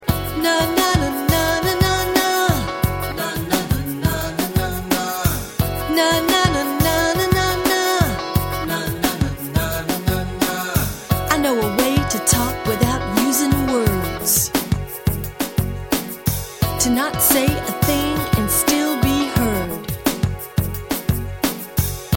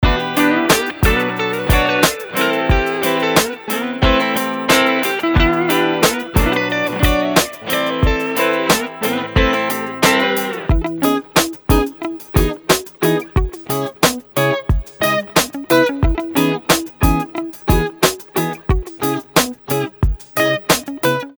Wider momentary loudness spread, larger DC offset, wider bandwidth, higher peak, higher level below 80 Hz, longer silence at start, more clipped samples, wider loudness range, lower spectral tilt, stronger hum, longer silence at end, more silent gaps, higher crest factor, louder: about the same, 7 LU vs 6 LU; neither; second, 17 kHz vs over 20 kHz; about the same, 0 dBFS vs 0 dBFS; second, -32 dBFS vs -24 dBFS; about the same, 0 s vs 0 s; neither; about the same, 3 LU vs 3 LU; about the same, -4 dB/octave vs -4 dB/octave; neither; about the same, 0 s vs 0.05 s; neither; about the same, 20 dB vs 16 dB; second, -19 LUFS vs -16 LUFS